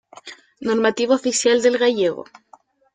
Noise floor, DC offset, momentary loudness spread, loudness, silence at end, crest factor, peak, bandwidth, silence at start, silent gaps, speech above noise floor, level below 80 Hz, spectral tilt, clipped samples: -52 dBFS; under 0.1%; 22 LU; -19 LUFS; 0.7 s; 16 dB; -6 dBFS; 9.6 kHz; 0.25 s; none; 34 dB; -66 dBFS; -2.5 dB/octave; under 0.1%